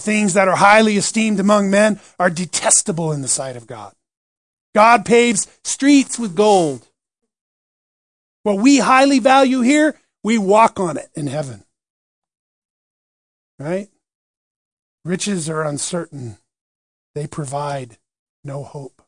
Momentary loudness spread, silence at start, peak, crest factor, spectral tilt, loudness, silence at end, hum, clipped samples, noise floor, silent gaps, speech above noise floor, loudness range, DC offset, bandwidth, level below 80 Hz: 19 LU; 0 s; 0 dBFS; 18 dB; -4 dB/octave; -15 LUFS; 0.2 s; none; under 0.1%; under -90 dBFS; 4.17-4.73 s, 7.41-8.44 s, 11.90-12.22 s, 12.39-13.58 s, 14.15-14.98 s, 16.61-17.14 s, 18.19-18.43 s; over 74 dB; 15 LU; 0.1%; 10.5 kHz; -62 dBFS